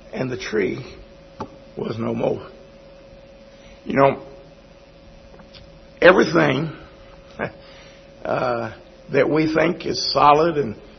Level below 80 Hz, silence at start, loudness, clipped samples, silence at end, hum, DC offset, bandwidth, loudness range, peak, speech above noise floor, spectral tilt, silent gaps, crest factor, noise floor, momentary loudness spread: -50 dBFS; 0.15 s; -20 LUFS; under 0.1%; 0.15 s; none; under 0.1%; 6.4 kHz; 8 LU; 0 dBFS; 28 dB; -5.5 dB/octave; none; 22 dB; -46 dBFS; 22 LU